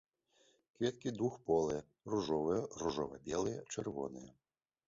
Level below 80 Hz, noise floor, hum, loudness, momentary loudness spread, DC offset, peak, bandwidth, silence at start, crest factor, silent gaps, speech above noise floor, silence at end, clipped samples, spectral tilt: -66 dBFS; -74 dBFS; none; -39 LUFS; 8 LU; under 0.1%; -20 dBFS; 7.6 kHz; 0.8 s; 18 dB; none; 35 dB; 0.55 s; under 0.1%; -6 dB/octave